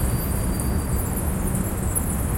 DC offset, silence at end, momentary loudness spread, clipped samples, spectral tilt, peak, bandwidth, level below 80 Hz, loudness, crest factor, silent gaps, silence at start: under 0.1%; 0 s; 1 LU; under 0.1%; -5.5 dB/octave; -8 dBFS; 17 kHz; -28 dBFS; -25 LUFS; 14 dB; none; 0 s